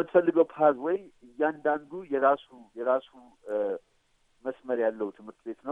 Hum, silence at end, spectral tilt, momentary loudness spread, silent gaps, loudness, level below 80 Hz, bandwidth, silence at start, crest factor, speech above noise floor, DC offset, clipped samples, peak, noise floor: none; 0 s; -8 dB/octave; 15 LU; none; -28 LUFS; -74 dBFS; 3.8 kHz; 0 s; 20 dB; 40 dB; under 0.1%; under 0.1%; -8 dBFS; -68 dBFS